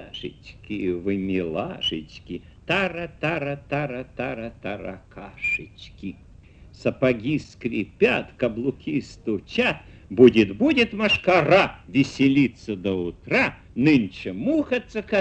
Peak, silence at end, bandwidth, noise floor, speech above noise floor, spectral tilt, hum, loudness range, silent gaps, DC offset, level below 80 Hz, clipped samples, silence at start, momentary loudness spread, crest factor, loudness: -2 dBFS; 0 s; 8.8 kHz; -48 dBFS; 24 dB; -6.5 dB/octave; none; 10 LU; none; under 0.1%; -50 dBFS; under 0.1%; 0 s; 17 LU; 22 dB; -23 LUFS